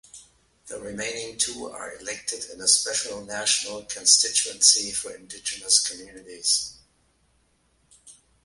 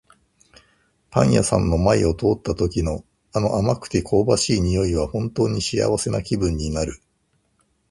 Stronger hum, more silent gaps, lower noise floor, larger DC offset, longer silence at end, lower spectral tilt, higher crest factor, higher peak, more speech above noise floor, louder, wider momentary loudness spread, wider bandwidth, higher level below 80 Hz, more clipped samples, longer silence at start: neither; neither; about the same, -66 dBFS vs -67 dBFS; neither; second, 0.3 s vs 0.95 s; second, 1.5 dB/octave vs -5.5 dB/octave; about the same, 24 dB vs 22 dB; about the same, -2 dBFS vs 0 dBFS; second, 41 dB vs 47 dB; about the same, -22 LUFS vs -21 LUFS; first, 19 LU vs 7 LU; about the same, 12 kHz vs 11.5 kHz; second, -62 dBFS vs -34 dBFS; neither; second, 0.15 s vs 1.1 s